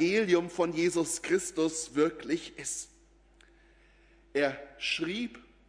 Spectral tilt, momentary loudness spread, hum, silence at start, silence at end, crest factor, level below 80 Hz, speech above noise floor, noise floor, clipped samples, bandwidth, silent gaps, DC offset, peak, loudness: -3.5 dB/octave; 9 LU; none; 0 s; 0.25 s; 20 dB; -64 dBFS; 31 dB; -61 dBFS; under 0.1%; 11 kHz; none; under 0.1%; -12 dBFS; -31 LUFS